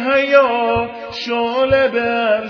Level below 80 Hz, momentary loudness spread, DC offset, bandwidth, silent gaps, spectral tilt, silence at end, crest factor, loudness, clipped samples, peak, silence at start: -46 dBFS; 9 LU; under 0.1%; 5.4 kHz; none; -5.5 dB/octave; 0 s; 14 dB; -16 LUFS; under 0.1%; 0 dBFS; 0 s